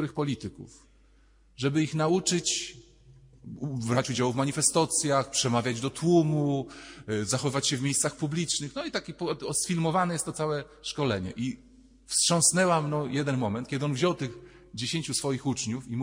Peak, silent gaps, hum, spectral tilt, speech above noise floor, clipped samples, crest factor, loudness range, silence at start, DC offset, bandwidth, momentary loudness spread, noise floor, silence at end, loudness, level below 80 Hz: -10 dBFS; none; none; -4 dB/octave; 32 dB; under 0.1%; 20 dB; 4 LU; 0 s; under 0.1%; 16 kHz; 11 LU; -60 dBFS; 0 s; -28 LUFS; -60 dBFS